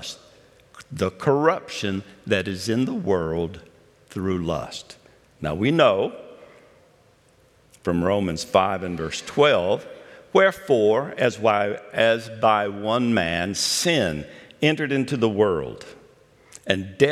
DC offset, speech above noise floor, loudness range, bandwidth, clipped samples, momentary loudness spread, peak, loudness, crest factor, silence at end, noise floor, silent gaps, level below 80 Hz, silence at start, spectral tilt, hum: under 0.1%; 36 dB; 5 LU; 15 kHz; under 0.1%; 13 LU; -2 dBFS; -22 LUFS; 22 dB; 0 s; -57 dBFS; none; -56 dBFS; 0 s; -4.5 dB/octave; none